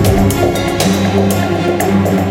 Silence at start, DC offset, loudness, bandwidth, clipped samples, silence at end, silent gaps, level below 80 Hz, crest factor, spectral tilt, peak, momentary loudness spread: 0 s; under 0.1%; -13 LUFS; 17 kHz; under 0.1%; 0 s; none; -28 dBFS; 12 dB; -5.5 dB/octave; 0 dBFS; 2 LU